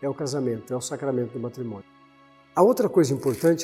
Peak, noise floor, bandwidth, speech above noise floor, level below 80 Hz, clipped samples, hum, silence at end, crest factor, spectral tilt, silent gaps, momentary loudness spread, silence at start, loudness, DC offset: -6 dBFS; -55 dBFS; 16.5 kHz; 31 dB; -68 dBFS; under 0.1%; none; 0 s; 20 dB; -6 dB/octave; none; 13 LU; 0 s; -24 LUFS; under 0.1%